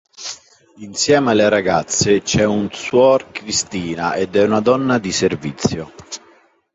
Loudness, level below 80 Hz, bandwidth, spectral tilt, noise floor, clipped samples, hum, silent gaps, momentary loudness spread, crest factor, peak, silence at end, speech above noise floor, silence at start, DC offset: -16 LUFS; -46 dBFS; 8.2 kHz; -4 dB/octave; -52 dBFS; under 0.1%; none; none; 16 LU; 16 dB; -2 dBFS; 0.6 s; 35 dB; 0.2 s; under 0.1%